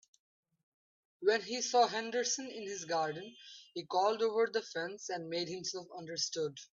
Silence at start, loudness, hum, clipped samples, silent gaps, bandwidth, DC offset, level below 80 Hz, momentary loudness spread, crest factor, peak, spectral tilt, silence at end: 1.2 s; -35 LUFS; none; under 0.1%; none; 7.8 kHz; under 0.1%; -86 dBFS; 13 LU; 20 dB; -16 dBFS; -2 dB/octave; 0.15 s